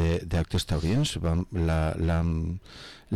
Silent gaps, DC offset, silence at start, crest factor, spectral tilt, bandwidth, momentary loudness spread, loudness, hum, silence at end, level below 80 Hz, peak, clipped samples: none; under 0.1%; 0 s; 8 dB; -6 dB/octave; 13 kHz; 10 LU; -27 LUFS; none; 0 s; -36 dBFS; -20 dBFS; under 0.1%